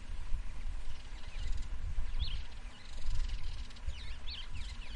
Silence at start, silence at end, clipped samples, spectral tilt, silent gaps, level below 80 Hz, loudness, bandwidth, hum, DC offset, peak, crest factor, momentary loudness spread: 0 s; 0 s; under 0.1%; -4 dB/octave; none; -38 dBFS; -45 LUFS; 9.2 kHz; none; under 0.1%; -20 dBFS; 14 dB; 8 LU